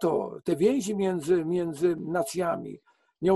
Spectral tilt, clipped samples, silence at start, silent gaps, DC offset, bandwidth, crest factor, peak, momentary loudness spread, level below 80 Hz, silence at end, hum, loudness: -6 dB/octave; under 0.1%; 0 s; none; under 0.1%; 12.5 kHz; 16 dB; -12 dBFS; 6 LU; -64 dBFS; 0 s; none; -27 LUFS